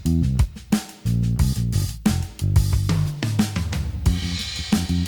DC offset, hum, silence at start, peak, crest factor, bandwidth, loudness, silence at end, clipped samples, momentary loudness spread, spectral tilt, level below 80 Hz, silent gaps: under 0.1%; none; 0 s; -6 dBFS; 16 dB; 19.5 kHz; -23 LUFS; 0 s; under 0.1%; 5 LU; -5.5 dB/octave; -28 dBFS; none